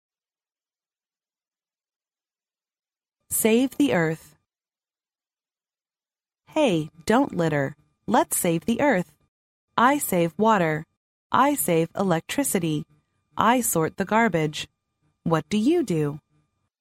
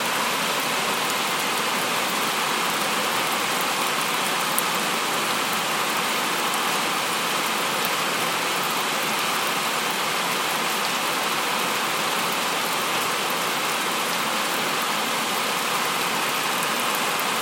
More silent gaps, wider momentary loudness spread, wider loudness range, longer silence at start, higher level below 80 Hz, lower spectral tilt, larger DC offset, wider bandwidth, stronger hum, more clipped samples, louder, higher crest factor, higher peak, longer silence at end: first, 9.28-9.68 s, 10.97-11.30 s vs none; first, 11 LU vs 1 LU; first, 5 LU vs 1 LU; first, 3.3 s vs 0 s; first, -62 dBFS vs -76 dBFS; first, -4.5 dB/octave vs -1 dB/octave; neither; about the same, 16 kHz vs 17 kHz; neither; neither; about the same, -23 LUFS vs -22 LUFS; about the same, 20 dB vs 22 dB; about the same, -4 dBFS vs -2 dBFS; first, 0.6 s vs 0 s